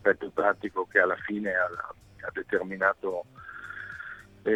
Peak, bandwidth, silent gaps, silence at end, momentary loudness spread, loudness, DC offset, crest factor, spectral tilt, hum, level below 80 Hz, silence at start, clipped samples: -6 dBFS; 10.5 kHz; none; 0 s; 16 LU; -29 LUFS; under 0.1%; 24 dB; -6.5 dB/octave; none; -64 dBFS; 0.05 s; under 0.1%